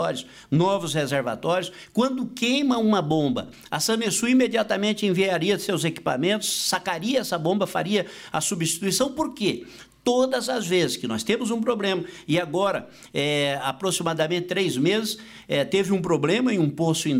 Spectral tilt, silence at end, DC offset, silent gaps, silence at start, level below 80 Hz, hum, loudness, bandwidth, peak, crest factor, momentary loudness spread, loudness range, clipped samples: -4 dB/octave; 0 s; under 0.1%; none; 0 s; -62 dBFS; none; -24 LUFS; 16 kHz; -10 dBFS; 14 dB; 5 LU; 2 LU; under 0.1%